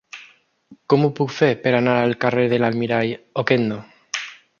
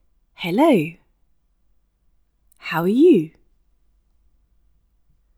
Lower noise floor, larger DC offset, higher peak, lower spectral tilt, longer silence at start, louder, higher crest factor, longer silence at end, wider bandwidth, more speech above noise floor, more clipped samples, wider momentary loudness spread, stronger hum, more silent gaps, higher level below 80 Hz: second, -50 dBFS vs -62 dBFS; neither; about the same, -2 dBFS vs -4 dBFS; about the same, -6 dB/octave vs -7 dB/octave; second, 0.15 s vs 0.4 s; about the same, -20 LUFS vs -18 LUFS; about the same, 20 dB vs 18 dB; second, 0.25 s vs 2.1 s; second, 7.2 kHz vs 15.5 kHz; second, 31 dB vs 46 dB; neither; second, 12 LU vs 17 LU; neither; neither; about the same, -62 dBFS vs -62 dBFS